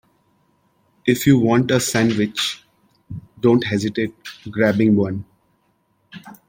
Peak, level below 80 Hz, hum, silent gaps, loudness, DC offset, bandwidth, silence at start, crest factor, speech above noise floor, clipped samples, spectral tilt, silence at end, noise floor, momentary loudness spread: -2 dBFS; -56 dBFS; none; none; -18 LUFS; under 0.1%; 16.5 kHz; 1.05 s; 18 dB; 47 dB; under 0.1%; -5.5 dB/octave; 0.15 s; -64 dBFS; 20 LU